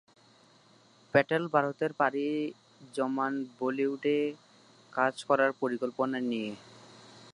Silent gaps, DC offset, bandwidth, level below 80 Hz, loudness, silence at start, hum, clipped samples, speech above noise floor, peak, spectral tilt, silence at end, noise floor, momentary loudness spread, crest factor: none; under 0.1%; 11 kHz; -78 dBFS; -30 LUFS; 1.15 s; none; under 0.1%; 31 dB; -8 dBFS; -6 dB/octave; 0.05 s; -61 dBFS; 11 LU; 24 dB